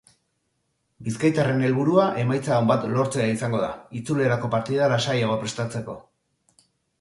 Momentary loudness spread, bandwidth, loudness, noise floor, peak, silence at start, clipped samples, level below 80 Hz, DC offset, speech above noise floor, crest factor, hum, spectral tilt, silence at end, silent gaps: 12 LU; 11.5 kHz; -23 LUFS; -73 dBFS; -6 dBFS; 1 s; under 0.1%; -60 dBFS; under 0.1%; 51 dB; 18 dB; none; -6 dB/octave; 1 s; none